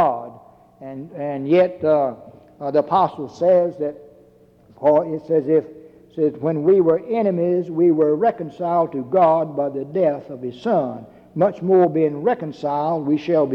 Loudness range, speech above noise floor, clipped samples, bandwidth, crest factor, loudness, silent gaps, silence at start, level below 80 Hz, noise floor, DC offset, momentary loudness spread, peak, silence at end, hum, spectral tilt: 2 LU; 33 dB; under 0.1%; 6.6 kHz; 14 dB; -19 LUFS; none; 0 s; -64 dBFS; -51 dBFS; under 0.1%; 14 LU; -6 dBFS; 0 s; none; -9 dB/octave